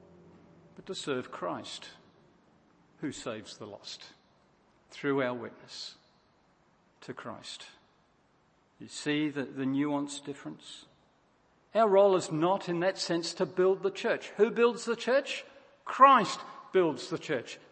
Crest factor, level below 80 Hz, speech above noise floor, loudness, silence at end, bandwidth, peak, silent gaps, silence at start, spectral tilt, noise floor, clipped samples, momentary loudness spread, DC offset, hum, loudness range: 26 dB; -78 dBFS; 38 dB; -29 LUFS; 0.15 s; 8.8 kHz; -6 dBFS; none; 0.8 s; -4.5 dB/octave; -68 dBFS; under 0.1%; 20 LU; under 0.1%; none; 16 LU